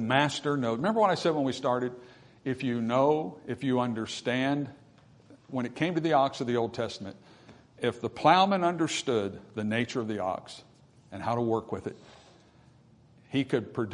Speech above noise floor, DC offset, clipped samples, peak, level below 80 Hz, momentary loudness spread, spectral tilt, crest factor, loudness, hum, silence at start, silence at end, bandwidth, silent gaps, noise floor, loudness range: 30 dB; under 0.1%; under 0.1%; -8 dBFS; -70 dBFS; 13 LU; -5.5 dB/octave; 22 dB; -29 LUFS; none; 0 s; 0 s; 11 kHz; none; -58 dBFS; 6 LU